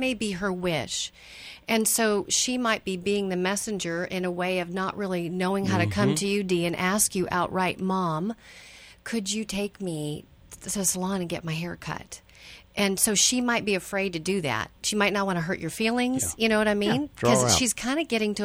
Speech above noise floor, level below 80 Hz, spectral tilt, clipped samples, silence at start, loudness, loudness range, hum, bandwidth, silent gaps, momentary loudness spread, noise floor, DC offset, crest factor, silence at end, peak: 23 dB; -54 dBFS; -3.5 dB/octave; under 0.1%; 0 s; -26 LUFS; 6 LU; none; over 20 kHz; none; 12 LU; -49 dBFS; under 0.1%; 20 dB; 0 s; -6 dBFS